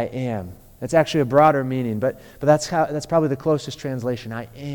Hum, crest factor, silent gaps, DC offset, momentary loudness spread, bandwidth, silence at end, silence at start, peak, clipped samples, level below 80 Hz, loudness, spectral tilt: none; 18 dB; none; under 0.1%; 14 LU; 19 kHz; 0 s; 0 s; -2 dBFS; under 0.1%; -50 dBFS; -21 LUFS; -6 dB/octave